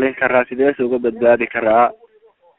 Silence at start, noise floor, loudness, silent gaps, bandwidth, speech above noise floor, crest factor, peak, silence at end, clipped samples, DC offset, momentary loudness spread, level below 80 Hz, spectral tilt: 0 s; -53 dBFS; -16 LUFS; none; 4 kHz; 37 dB; 16 dB; 0 dBFS; 0.65 s; under 0.1%; under 0.1%; 4 LU; -54 dBFS; -4 dB/octave